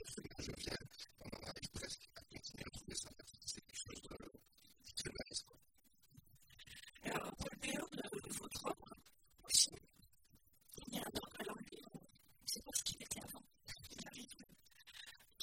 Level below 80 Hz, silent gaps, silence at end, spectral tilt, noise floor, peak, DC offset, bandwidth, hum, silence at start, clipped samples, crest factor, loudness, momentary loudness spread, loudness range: -66 dBFS; none; 0 s; -1.5 dB/octave; -75 dBFS; -18 dBFS; under 0.1%; 16.5 kHz; none; 0 s; under 0.1%; 30 dB; -45 LUFS; 18 LU; 10 LU